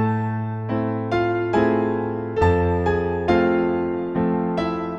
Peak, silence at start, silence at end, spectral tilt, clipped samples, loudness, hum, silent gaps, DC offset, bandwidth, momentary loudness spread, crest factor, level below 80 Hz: -6 dBFS; 0 s; 0 s; -8.5 dB/octave; under 0.1%; -22 LUFS; none; none; under 0.1%; 8 kHz; 6 LU; 14 dB; -40 dBFS